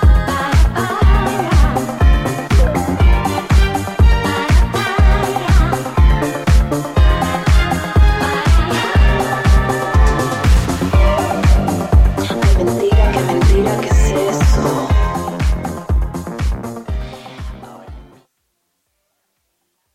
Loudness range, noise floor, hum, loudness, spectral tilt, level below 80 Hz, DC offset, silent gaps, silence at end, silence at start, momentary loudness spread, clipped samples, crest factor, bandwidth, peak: 9 LU; -68 dBFS; none; -15 LUFS; -6 dB/octave; -16 dBFS; under 0.1%; none; 1.9 s; 0 s; 7 LU; under 0.1%; 12 dB; 14.5 kHz; 0 dBFS